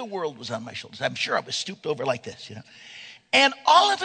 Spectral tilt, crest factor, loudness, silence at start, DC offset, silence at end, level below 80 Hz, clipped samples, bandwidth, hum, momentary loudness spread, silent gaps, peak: -2.5 dB/octave; 22 dB; -23 LUFS; 0 s; under 0.1%; 0 s; -72 dBFS; under 0.1%; 9.4 kHz; none; 24 LU; none; -4 dBFS